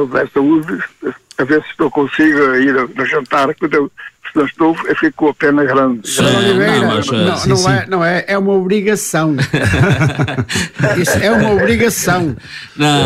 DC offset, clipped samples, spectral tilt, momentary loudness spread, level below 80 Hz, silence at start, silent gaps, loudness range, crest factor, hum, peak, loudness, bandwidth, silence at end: under 0.1%; under 0.1%; -5 dB/octave; 7 LU; -40 dBFS; 0 s; none; 2 LU; 12 dB; none; 0 dBFS; -13 LUFS; 16 kHz; 0 s